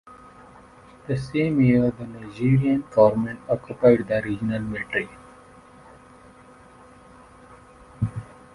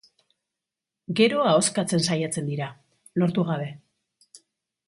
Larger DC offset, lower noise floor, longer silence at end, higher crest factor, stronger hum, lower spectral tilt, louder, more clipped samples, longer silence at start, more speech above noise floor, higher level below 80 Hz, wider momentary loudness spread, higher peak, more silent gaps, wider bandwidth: neither; second, -49 dBFS vs -88 dBFS; second, 0.3 s vs 0.5 s; about the same, 22 dB vs 20 dB; neither; first, -9 dB/octave vs -4.5 dB/octave; about the same, -22 LUFS vs -24 LUFS; neither; second, 0.1 s vs 1.1 s; second, 28 dB vs 64 dB; first, -50 dBFS vs -68 dBFS; about the same, 13 LU vs 13 LU; about the same, -4 dBFS vs -6 dBFS; neither; about the same, 11.5 kHz vs 11.5 kHz